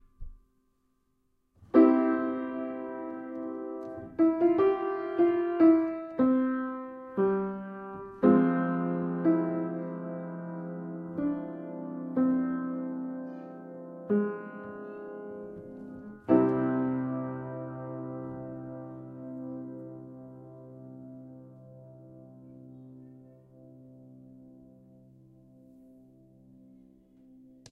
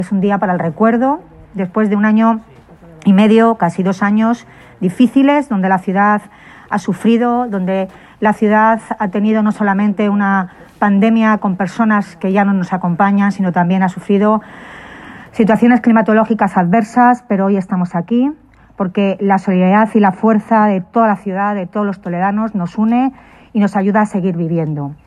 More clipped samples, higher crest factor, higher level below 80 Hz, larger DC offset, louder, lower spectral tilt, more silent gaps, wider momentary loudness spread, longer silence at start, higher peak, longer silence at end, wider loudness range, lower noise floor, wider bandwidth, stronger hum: neither; first, 22 dB vs 14 dB; second, -62 dBFS vs -52 dBFS; neither; second, -29 LUFS vs -14 LUFS; first, -10.5 dB/octave vs -8 dB/octave; neither; first, 24 LU vs 9 LU; first, 0.2 s vs 0 s; second, -8 dBFS vs 0 dBFS; first, 0.35 s vs 0.15 s; first, 18 LU vs 2 LU; first, -73 dBFS vs -40 dBFS; second, 4.2 kHz vs 10.5 kHz; neither